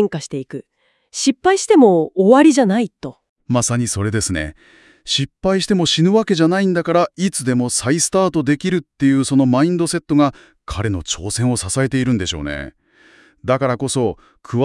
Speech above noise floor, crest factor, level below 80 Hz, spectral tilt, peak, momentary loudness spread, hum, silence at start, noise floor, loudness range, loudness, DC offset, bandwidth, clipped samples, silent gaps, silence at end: 34 dB; 16 dB; -44 dBFS; -5 dB/octave; 0 dBFS; 15 LU; none; 0 s; -50 dBFS; 5 LU; -16 LUFS; under 0.1%; 12 kHz; under 0.1%; 3.29-3.36 s; 0 s